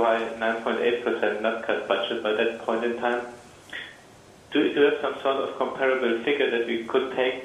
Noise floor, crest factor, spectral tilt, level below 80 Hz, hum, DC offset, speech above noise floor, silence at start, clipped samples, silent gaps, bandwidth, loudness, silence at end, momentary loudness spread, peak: -50 dBFS; 18 dB; -4.5 dB/octave; -66 dBFS; none; under 0.1%; 25 dB; 0 s; under 0.1%; none; 11.5 kHz; -25 LUFS; 0 s; 7 LU; -8 dBFS